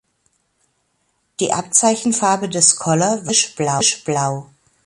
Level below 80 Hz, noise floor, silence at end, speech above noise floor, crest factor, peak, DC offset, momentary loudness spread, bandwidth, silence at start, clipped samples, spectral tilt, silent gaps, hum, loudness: -60 dBFS; -67 dBFS; 0.4 s; 49 dB; 20 dB; 0 dBFS; under 0.1%; 9 LU; 12 kHz; 1.4 s; under 0.1%; -3 dB/octave; none; none; -16 LUFS